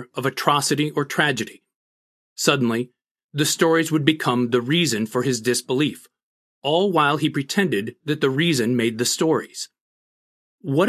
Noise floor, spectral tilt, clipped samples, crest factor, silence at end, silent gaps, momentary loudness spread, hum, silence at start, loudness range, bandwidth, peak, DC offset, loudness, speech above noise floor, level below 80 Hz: under -90 dBFS; -4 dB/octave; under 0.1%; 22 dB; 0 s; 1.75-2.36 s, 3.11-3.15 s, 3.24-3.29 s, 6.23-6.61 s, 9.81-10.58 s; 10 LU; none; 0 s; 2 LU; 14.5 kHz; 0 dBFS; under 0.1%; -21 LUFS; over 69 dB; -68 dBFS